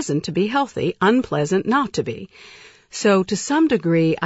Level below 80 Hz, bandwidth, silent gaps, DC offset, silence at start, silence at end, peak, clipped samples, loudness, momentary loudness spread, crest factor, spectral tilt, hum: -56 dBFS; 8 kHz; none; under 0.1%; 0 s; 0 s; -6 dBFS; under 0.1%; -20 LUFS; 10 LU; 14 dB; -5.5 dB/octave; none